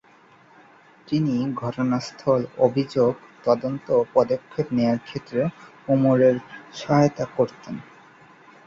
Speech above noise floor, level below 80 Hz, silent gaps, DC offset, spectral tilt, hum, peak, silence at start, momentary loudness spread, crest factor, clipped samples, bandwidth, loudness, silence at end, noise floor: 31 dB; -60 dBFS; none; under 0.1%; -7.5 dB/octave; none; -4 dBFS; 1.1 s; 9 LU; 20 dB; under 0.1%; 7.6 kHz; -23 LUFS; 0.85 s; -54 dBFS